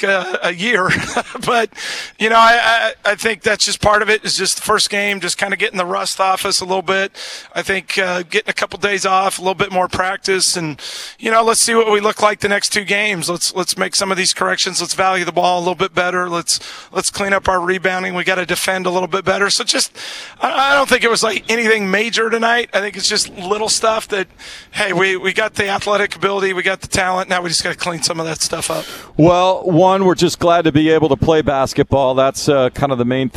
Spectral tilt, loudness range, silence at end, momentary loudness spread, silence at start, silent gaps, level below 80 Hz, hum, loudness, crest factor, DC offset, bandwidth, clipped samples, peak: -3 dB/octave; 4 LU; 0.1 s; 7 LU; 0 s; none; -44 dBFS; none; -15 LUFS; 16 dB; under 0.1%; 14.5 kHz; under 0.1%; 0 dBFS